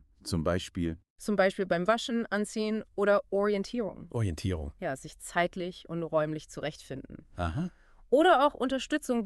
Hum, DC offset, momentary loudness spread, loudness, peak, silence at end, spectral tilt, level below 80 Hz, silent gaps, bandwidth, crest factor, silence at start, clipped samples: none; under 0.1%; 13 LU; -30 LUFS; -12 dBFS; 0 s; -5.5 dB/octave; -52 dBFS; 1.10-1.16 s; 13.5 kHz; 18 dB; 0.25 s; under 0.1%